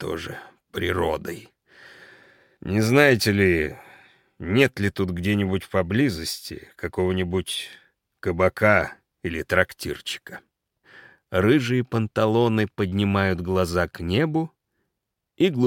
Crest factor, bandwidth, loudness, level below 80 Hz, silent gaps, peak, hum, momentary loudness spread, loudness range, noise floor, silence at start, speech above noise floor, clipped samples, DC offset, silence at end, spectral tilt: 20 dB; 17 kHz; -23 LUFS; -52 dBFS; none; -2 dBFS; none; 15 LU; 3 LU; -81 dBFS; 0 s; 59 dB; under 0.1%; under 0.1%; 0 s; -6 dB/octave